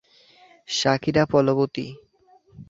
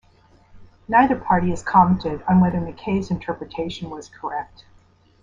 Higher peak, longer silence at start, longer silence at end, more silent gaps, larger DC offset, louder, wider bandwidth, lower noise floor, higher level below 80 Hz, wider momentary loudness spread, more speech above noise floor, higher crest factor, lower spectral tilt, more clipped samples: about the same, -4 dBFS vs -2 dBFS; first, 0.7 s vs 0.55 s; second, 0.05 s vs 0.8 s; neither; neither; about the same, -22 LUFS vs -21 LUFS; about the same, 7.8 kHz vs 7.6 kHz; about the same, -57 dBFS vs -54 dBFS; second, -56 dBFS vs -44 dBFS; second, 12 LU vs 15 LU; about the same, 36 dB vs 34 dB; about the same, 20 dB vs 20 dB; second, -5 dB/octave vs -7.5 dB/octave; neither